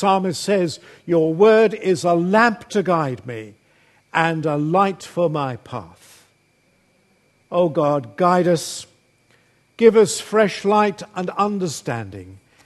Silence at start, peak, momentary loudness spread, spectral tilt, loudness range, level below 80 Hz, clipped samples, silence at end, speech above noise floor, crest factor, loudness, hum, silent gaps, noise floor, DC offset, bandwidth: 0 s; 0 dBFS; 15 LU; -5.5 dB/octave; 6 LU; -64 dBFS; under 0.1%; 0.3 s; 42 dB; 20 dB; -19 LUFS; none; none; -61 dBFS; under 0.1%; 12.5 kHz